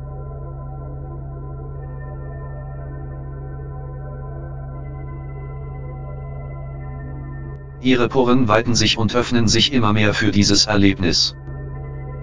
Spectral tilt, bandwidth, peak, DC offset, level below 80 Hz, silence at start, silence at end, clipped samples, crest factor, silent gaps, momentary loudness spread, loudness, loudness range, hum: -4.5 dB/octave; 7.6 kHz; 0 dBFS; under 0.1%; -34 dBFS; 0 s; 0 s; under 0.1%; 20 dB; none; 17 LU; -16 LUFS; 16 LU; none